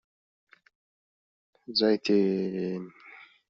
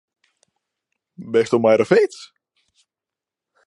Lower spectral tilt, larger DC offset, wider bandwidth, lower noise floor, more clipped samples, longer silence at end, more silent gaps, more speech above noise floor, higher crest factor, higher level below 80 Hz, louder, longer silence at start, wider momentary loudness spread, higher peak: second, -4.5 dB/octave vs -6 dB/octave; neither; second, 7.4 kHz vs 11 kHz; second, -52 dBFS vs -88 dBFS; neither; second, 0.25 s vs 1.4 s; neither; second, 26 dB vs 71 dB; about the same, 18 dB vs 20 dB; about the same, -74 dBFS vs -70 dBFS; second, -27 LUFS vs -17 LUFS; first, 1.7 s vs 1.2 s; about the same, 22 LU vs 21 LU; second, -12 dBFS vs -2 dBFS